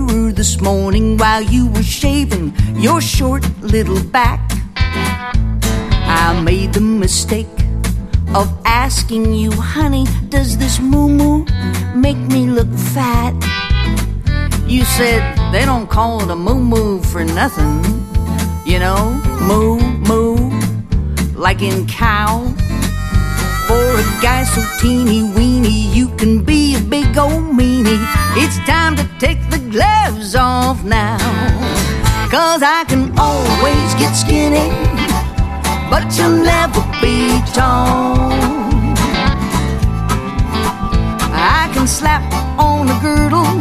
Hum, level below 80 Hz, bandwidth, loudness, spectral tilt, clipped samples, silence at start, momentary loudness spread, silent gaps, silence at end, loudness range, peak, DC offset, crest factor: none; -20 dBFS; 14.5 kHz; -14 LUFS; -5 dB/octave; under 0.1%; 0 s; 5 LU; none; 0 s; 2 LU; 0 dBFS; under 0.1%; 12 dB